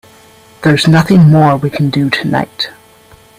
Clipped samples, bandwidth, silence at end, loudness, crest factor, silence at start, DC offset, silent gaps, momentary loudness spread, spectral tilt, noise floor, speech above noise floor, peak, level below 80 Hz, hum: under 0.1%; 15 kHz; 0.7 s; -10 LUFS; 12 dB; 0.6 s; under 0.1%; none; 11 LU; -6.5 dB/octave; -42 dBFS; 33 dB; 0 dBFS; -44 dBFS; none